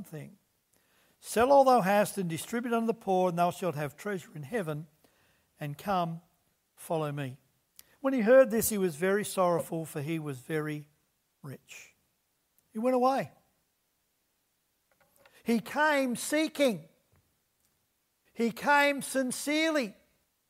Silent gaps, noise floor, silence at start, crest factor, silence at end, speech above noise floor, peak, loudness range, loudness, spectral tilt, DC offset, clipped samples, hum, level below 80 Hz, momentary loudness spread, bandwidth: none; -77 dBFS; 0 s; 18 dB; 0.6 s; 48 dB; -12 dBFS; 9 LU; -29 LUFS; -4.5 dB/octave; under 0.1%; under 0.1%; none; -68 dBFS; 19 LU; 16 kHz